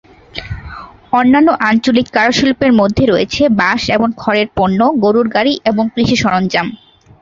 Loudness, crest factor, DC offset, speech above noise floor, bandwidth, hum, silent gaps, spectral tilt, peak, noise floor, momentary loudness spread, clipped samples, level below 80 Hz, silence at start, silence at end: -12 LUFS; 12 dB; under 0.1%; 20 dB; 7.6 kHz; none; none; -5.5 dB/octave; -2 dBFS; -32 dBFS; 15 LU; under 0.1%; -38 dBFS; 0.35 s; 0.45 s